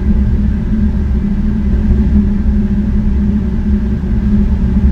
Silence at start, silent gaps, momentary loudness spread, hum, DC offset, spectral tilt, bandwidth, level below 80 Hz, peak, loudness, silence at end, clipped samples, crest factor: 0 s; none; 3 LU; none; under 0.1%; -10.5 dB/octave; 4.6 kHz; -14 dBFS; 0 dBFS; -14 LUFS; 0 s; under 0.1%; 12 dB